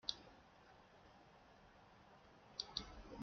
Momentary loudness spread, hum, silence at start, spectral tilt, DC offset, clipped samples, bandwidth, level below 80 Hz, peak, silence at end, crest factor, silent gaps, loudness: 19 LU; none; 0.05 s; -1.5 dB/octave; under 0.1%; under 0.1%; 6.8 kHz; -68 dBFS; -22 dBFS; 0 s; 34 dB; none; -50 LUFS